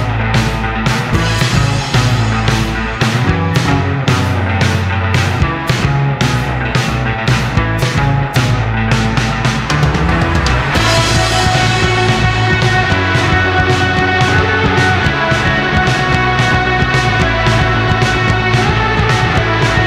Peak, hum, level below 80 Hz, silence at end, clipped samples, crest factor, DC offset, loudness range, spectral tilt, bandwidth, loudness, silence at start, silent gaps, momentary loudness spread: 0 dBFS; none; -24 dBFS; 0 s; under 0.1%; 12 dB; under 0.1%; 3 LU; -5 dB/octave; 14.5 kHz; -13 LUFS; 0 s; none; 3 LU